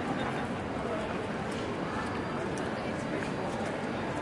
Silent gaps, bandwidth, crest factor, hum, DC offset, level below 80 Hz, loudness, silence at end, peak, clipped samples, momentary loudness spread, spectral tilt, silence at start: none; 11.5 kHz; 14 dB; none; under 0.1%; -54 dBFS; -34 LUFS; 0 s; -20 dBFS; under 0.1%; 1 LU; -6 dB/octave; 0 s